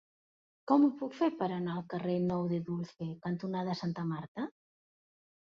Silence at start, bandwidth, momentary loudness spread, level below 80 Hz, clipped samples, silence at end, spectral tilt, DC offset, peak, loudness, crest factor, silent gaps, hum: 0.65 s; 7 kHz; 13 LU; -72 dBFS; under 0.1%; 0.95 s; -8.5 dB/octave; under 0.1%; -14 dBFS; -34 LUFS; 20 dB; 4.28-4.35 s; none